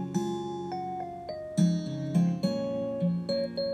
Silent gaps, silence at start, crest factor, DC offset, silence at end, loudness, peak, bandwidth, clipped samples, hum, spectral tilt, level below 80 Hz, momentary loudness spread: none; 0 s; 16 dB; under 0.1%; 0 s; -31 LUFS; -14 dBFS; 9.8 kHz; under 0.1%; none; -7.5 dB/octave; -64 dBFS; 9 LU